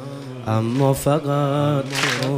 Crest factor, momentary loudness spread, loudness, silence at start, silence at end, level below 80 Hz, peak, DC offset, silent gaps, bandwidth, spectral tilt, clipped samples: 16 dB; 6 LU; -20 LUFS; 0 s; 0 s; -50 dBFS; -4 dBFS; under 0.1%; none; 15.5 kHz; -5.5 dB/octave; under 0.1%